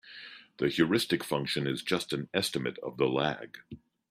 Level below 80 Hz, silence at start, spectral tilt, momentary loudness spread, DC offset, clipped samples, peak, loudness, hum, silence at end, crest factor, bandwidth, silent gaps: -66 dBFS; 0.05 s; -4.5 dB/octave; 19 LU; under 0.1%; under 0.1%; -10 dBFS; -30 LUFS; none; 0.35 s; 20 dB; 15.5 kHz; none